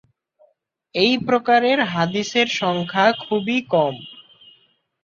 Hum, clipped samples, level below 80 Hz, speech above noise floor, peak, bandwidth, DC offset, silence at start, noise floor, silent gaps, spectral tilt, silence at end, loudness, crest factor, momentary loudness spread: none; under 0.1%; -64 dBFS; 44 dB; -2 dBFS; 7.6 kHz; under 0.1%; 0.95 s; -63 dBFS; none; -4.5 dB/octave; 0.85 s; -19 LUFS; 18 dB; 8 LU